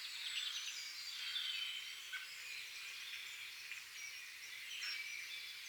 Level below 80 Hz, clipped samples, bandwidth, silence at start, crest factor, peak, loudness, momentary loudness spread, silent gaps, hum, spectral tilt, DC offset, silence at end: under -90 dBFS; under 0.1%; over 20 kHz; 0 s; 18 dB; -30 dBFS; -44 LUFS; 7 LU; none; none; 4 dB/octave; under 0.1%; 0 s